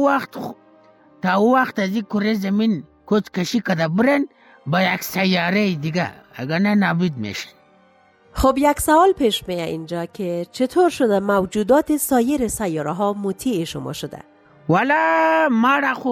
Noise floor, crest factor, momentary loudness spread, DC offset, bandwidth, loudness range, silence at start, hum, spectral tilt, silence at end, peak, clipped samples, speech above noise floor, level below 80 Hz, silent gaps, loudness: -54 dBFS; 16 dB; 12 LU; under 0.1%; 17 kHz; 2 LU; 0 s; none; -5 dB/octave; 0 s; -4 dBFS; under 0.1%; 35 dB; -44 dBFS; none; -19 LUFS